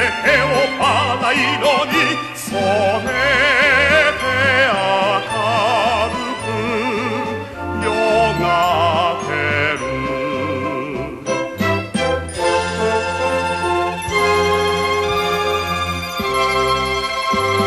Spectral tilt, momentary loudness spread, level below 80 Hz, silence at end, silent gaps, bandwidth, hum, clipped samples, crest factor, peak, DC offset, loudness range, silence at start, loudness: -4 dB/octave; 8 LU; -40 dBFS; 0 s; none; 13 kHz; none; under 0.1%; 16 dB; -2 dBFS; under 0.1%; 5 LU; 0 s; -17 LUFS